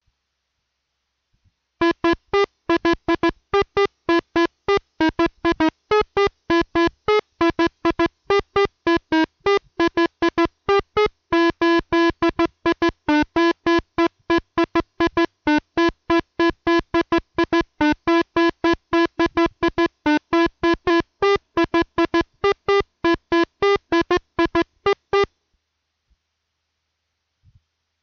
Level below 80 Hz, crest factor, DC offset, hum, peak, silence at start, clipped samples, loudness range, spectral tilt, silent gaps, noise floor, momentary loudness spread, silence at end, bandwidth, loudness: -44 dBFS; 12 dB; under 0.1%; none; -8 dBFS; 1.8 s; under 0.1%; 3 LU; -5.5 dB/octave; none; -76 dBFS; 3 LU; 2.75 s; 6.8 kHz; -20 LUFS